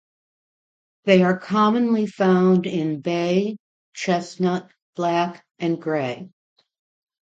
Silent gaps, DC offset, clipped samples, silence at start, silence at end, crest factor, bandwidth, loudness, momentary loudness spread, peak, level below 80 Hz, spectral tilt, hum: 3.60-3.92 s, 4.82-4.93 s; under 0.1%; under 0.1%; 1.05 s; 0.95 s; 20 dB; 7.8 kHz; -21 LUFS; 12 LU; -2 dBFS; -68 dBFS; -7 dB/octave; none